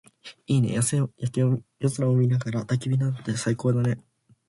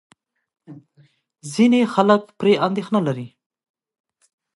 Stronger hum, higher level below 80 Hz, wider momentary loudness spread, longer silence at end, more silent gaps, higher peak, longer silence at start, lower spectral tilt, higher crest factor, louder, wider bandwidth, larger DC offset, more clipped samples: neither; first, -60 dBFS vs -70 dBFS; second, 6 LU vs 14 LU; second, 0.5 s vs 1.3 s; neither; second, -10 dBFS vs 0 dBFS; second, 0.25 s vs 0.7 s; about the same, -6.5 dB/octave vs -6 dB/octave; second, 14 dB vs 20 dB; second, -25 LUFS vs -19 LUFS; about the same, 11.5 kHz vs 11.5 kHz; neither; neither